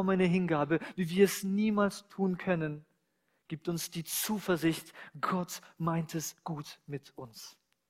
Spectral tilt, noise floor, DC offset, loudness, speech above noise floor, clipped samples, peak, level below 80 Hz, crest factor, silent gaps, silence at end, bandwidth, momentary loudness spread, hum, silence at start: -5.5 dB/octave; -77 dBFS; under 0.1%; -32 LUFS; 45 dB; under 0.1%; -12 dBFS; -68 dBFS; 20 dB; none; 0.4 s; 16 kHz; 17 LU; none; 0 s